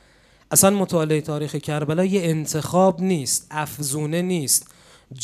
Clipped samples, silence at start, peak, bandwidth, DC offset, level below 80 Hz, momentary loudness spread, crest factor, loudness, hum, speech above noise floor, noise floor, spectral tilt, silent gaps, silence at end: under 0.1%; 0.5 s; 0 dBFS; 16 kHz; under 0.1%; -60 dBFS; 9 LU; 20 dB; -21 LUFS; none; 34 dB; -55 dBFS; -4.5 dB/octave; none; 0 s